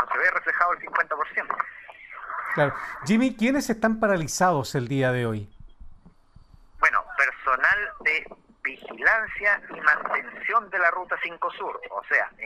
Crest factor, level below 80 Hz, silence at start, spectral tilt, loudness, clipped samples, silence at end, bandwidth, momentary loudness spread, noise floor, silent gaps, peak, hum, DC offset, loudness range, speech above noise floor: 20 dB; -54 dBFS; 0 s; -5 dB/octave; -24 LUFS; under 0.1%; 0 s; 15.5 kHz; 11 LU; -52 dBFS; none; -4 dBFS; none; under 0.1%; 3 LU; 27 dB